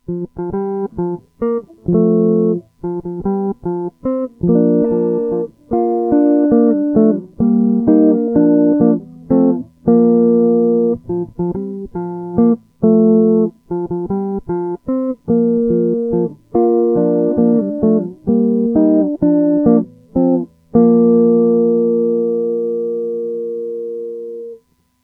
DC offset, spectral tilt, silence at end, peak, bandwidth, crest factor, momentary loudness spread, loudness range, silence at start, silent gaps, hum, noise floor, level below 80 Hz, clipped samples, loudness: under 0.1%; -13.5 dB/octave; 0.5 s; 0 dBFS; 2.1 kHz; 14 dB; 11 LU; 5 LU; 0.1 s; none; none; -45 dBFS; -46 dBFS; under 0.1%; -15 LUFS